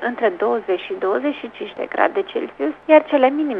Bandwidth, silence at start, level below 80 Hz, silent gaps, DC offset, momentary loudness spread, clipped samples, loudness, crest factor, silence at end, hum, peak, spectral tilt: 4.9 kHz; 0 s; -64 dBFS; none; under 0.1%; 12 LU; under 0.1%; -19 LUFS; 18 dB; 0 s; 50 Hz at -60 dBFS; 0 dBFS; -6.5 dB/octave